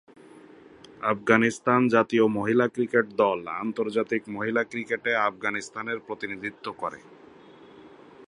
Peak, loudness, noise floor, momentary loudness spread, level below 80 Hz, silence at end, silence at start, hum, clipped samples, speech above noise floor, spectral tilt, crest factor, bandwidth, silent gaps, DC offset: -4 dBFS; -26 LUFS; -50 dBFS; 12 LU; -68 dBFS; 0 s; 1 s; none; under 0.1%; 25 dB; -5.5 dB/octave; 24 dB; 11 kHz; none; under 0.1%